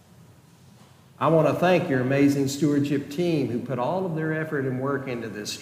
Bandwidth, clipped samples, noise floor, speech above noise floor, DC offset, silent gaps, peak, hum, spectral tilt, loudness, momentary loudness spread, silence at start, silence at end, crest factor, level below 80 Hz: 16 kHz; under 0.1%; -52 dBFS; 29 dB; under 0.1%; none; -8 dBFS; none; -6.5 dB/octave; -24 LUFS; 7 LU; 1.2 s; 0 s; 18 dB; -66 dBFS